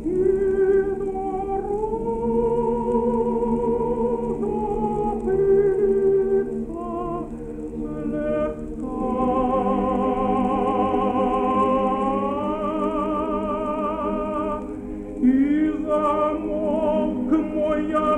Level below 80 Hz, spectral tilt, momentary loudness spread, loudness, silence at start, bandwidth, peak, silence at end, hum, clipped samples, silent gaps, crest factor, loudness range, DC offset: -40 dBFS; -8.5 dB/octave; 9 LU; -23 LUFS; 0 s; 9.4 kHz; -8 dBFS; 0 s; none; under 0.1%; none; 14 dB; 3 LU; under 0.1%